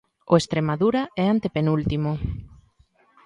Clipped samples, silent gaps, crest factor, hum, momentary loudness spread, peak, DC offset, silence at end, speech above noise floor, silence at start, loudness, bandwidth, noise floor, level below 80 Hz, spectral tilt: under 0.1%; none; 20 dB; none; 8 LU; -4 dBFS; under 0.1%; 0.8 s; 39 dB; 0.3 s; -23 LUFS; 11 kHz; -60 dBFS; -42 dBFS; -7 dB/octave